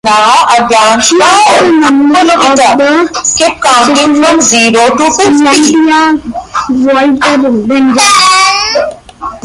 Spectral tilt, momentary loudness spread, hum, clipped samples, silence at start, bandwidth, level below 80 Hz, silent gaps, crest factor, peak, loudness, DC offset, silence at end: -2 dB/octave; 6 LU; none; 0.4%; 0.05 s; 16 kHz; -42 dBFS; none; 6 dB; 0 dBFS; -6 LUFS; under 0.1%; 0.05 s